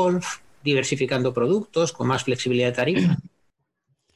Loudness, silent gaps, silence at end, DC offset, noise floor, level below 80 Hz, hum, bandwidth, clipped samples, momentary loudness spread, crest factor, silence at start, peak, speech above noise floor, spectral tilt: -23 LUFS; none; 0.9 s; 0.1%; -72 dBFS; -58 dBFS; none; 12 kHz; under 0.1%; 5 LU; 16 dB; 0 s; -8 dBFS; 50 dB; -5.5 dB/octave